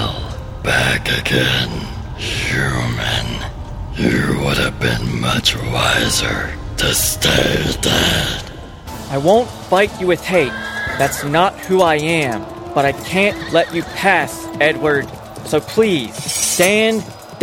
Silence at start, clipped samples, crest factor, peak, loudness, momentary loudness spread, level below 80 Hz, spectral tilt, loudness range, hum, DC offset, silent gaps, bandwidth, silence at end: 0 s; under 0.1%; 16 dB; -2 dBFS; -16 LUFS; 11 LU; -32 dBFS; -3.5 dB/octave; 3 LU; none; under 0.1%; none; 16.5 kHz; 0 s